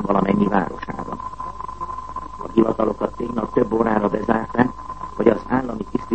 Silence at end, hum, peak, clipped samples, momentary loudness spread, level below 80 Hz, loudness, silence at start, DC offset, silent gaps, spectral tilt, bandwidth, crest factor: 0 s; none; 0 dBFS; under 0.1%; 13 LU; -42 dBFS; -22 LUFS; 0 s; 0.9%; none; -8.5 dB/octave; 8.6 kHz; 20 dB